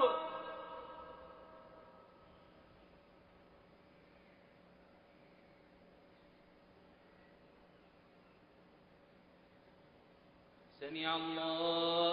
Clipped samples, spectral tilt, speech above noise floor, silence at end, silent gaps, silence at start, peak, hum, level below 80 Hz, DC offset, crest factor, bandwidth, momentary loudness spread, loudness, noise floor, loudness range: under 0.1%; -1.5 dB/octave; 29 dB; 0 s; none; 0 s; -20 dBFS; 60 Hz at -75 dBFS; -76 dBFS; under 0.1%; 24 dB; 5.2 kHz; 28 LU; -39 LUFS; -65 dBFS; 22 LU